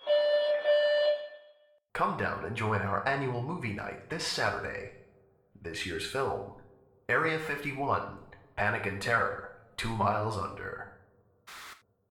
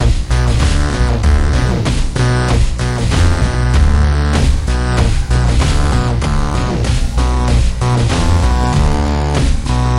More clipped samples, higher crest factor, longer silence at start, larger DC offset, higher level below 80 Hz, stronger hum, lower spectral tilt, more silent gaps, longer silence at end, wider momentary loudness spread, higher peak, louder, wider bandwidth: neither; first, 18 dB vs 10 dB; about the same, 0 s vs 0 s; second, under 0.1% vs 1%; second, -58 dBFS vs -14 dBFS; neither; second, -4.5 dB/octave vs -6 dB/octave; neither; first, 0.35 s vs 0 s; first, 19 LU vs 3 LU; second, -14 dBFS vs -2 dBFS; second, -31 LUFS vs -14 LUFS; first, 16 kHz vs 11.5 kHz